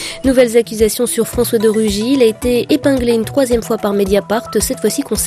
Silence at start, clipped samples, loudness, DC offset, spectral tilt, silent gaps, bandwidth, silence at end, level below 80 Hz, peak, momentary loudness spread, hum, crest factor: 0 s; under 0.1%; -14 LUFS; under 0.1%; -4.5 dB/octave; none; 15 kHz; 0 s; -34 dBFS; 0 dBFS; 4 LU; none; 14 dB